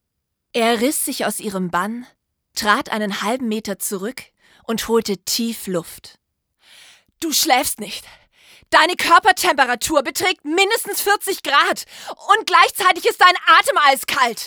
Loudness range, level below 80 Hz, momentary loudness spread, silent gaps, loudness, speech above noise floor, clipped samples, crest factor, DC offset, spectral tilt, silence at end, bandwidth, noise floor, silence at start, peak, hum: 8 LU; -56 dBFS; 14 LU; none; -17 LUFS; 59 dB; under 0.1%; 18 dB; under 0.1%; -2 dB/octave; 0 s; over 20 kHz; -77 dBFS; 0.55 s; 0 dBFS; none